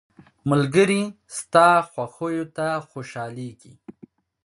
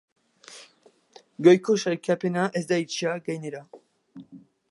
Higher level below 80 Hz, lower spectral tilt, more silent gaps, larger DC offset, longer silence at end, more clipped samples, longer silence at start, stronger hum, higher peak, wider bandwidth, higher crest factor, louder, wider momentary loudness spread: first, -62 dBFS vs -78 dBFS; about the same, -5.5 dB/octave vs -5.5 dB/octave; neither; neither; first, 0.55 s vs 0.35 s; neither; about the same, 0.45 s vs 0.5 s; neither; about the same, -2 dBFS vs -4 dBFS; about the same, 11.5 kHz vs 11.5 kHz; about the same, 20 dB vs 22 dB; first, -21 LUFS vs -24 LUFS; second, 17 LU vs 26 LU